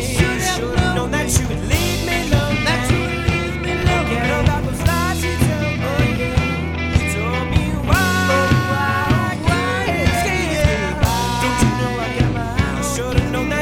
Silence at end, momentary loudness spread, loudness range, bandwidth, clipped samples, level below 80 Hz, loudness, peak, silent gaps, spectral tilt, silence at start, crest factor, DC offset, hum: 0 s; 3 LU; 1 LU; 17 kHz; under 0.1%; -26 dBFS; -18 LUFS; -2 dBFS; none; -5 dB/octave; 0 s; 16 dB; under 0.1%; none